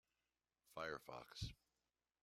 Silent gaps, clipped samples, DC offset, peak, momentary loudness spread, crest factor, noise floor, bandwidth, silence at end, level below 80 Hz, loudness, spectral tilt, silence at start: none; under 0.1%; under 0.1%; -34 dBFS; 6 LU; 22 dB; under -90 dBFS; 16 kHz; 0.7 s; -68 dBFS; -53 LUFS; -4.5 dB/octave; 0.7 s